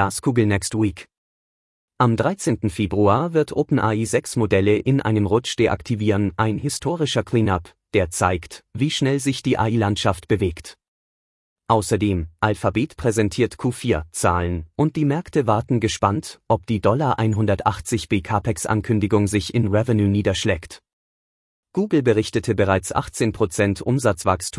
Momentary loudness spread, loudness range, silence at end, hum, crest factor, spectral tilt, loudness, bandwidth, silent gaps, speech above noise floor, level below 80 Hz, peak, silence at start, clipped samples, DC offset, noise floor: 5 LU; 3 LU; 0 s; none; 18 dB; -6 dB/octave; -21 LUFS; 12 kHz; 1.18-1.88 s, 10.88-11.56 s, 20.93-21.63 s; over 70 dB; -46 dBFS; -2 dBFS; 0 s; under 0.1%; under 0.1%; under -90 dBFS